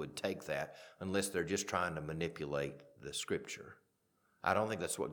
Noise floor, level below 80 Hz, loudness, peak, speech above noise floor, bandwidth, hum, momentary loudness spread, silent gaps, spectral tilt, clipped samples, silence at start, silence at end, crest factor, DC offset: -78 dBFS; -68 dBFS; -39 LUFS; -16 dBFS; 39 dB; 19 kHz; none; 12 LU; none; -4 dB/octave; under 0.1%; 0 s; 0 s; 24 dB; under 0.1%